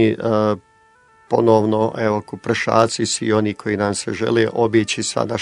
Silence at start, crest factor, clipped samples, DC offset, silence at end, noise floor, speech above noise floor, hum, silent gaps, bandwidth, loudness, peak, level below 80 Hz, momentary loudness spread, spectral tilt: 0 s; 18 dB; under 0.1%; under 0.1%; 0 s; -53 dBFS; 35 dB; none; none; 11 kHz; -18 LUFS; 0 dBFS; -60 dBFS; 7 LU; -5 dB/octave